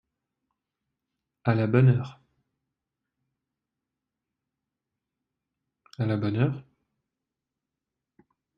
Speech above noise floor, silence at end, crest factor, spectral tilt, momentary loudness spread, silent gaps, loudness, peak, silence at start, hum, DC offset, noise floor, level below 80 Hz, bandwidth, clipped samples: 64 dB; 1.95 s; 24 dB; -10 dB/octave; 13 LU; none; -25 LUFS; -8 dBFS; 1.45 s; none; under 0.1%; -87 dBFS; -64 dBFS; 5.8 kHz; under 0.1%